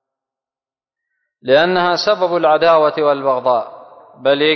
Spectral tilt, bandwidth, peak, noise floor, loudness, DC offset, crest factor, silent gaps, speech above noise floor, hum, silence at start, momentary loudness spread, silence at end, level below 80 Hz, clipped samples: -5 dB/octave; 6.4 kHz; -2 dBFS; under -90 dBFS; -14 LUFS; under 0.1%; 14 dB; none; over 76 dB; none; 1.45 s; 8 LU; 0 s; -62 dBFS; under 0.1%